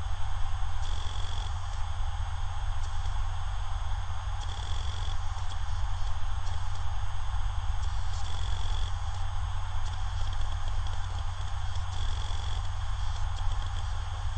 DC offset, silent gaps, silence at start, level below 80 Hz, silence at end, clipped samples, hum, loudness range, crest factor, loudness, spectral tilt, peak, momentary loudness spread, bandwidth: under 0.1%; none; 0 s; -32 dBFS; 0 s; under 0.1%; none; 1 LU; 12 dB; -36 LUFS; -3.5 dB/octave; -16 dBFS; 2 LU; 8.8 kHz